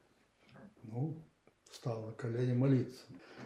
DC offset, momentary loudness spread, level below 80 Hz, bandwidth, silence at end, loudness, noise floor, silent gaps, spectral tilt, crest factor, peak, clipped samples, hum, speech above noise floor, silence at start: under 0.1%; 23 LU; -78 dBFS; 10.5 kHz; 0 s; -37 LUFS; -69 dBFS; none; -8.5 dB/octave; 18 dB; -22 dBFS; under 0.1%; none; 33 dB; 0.55 s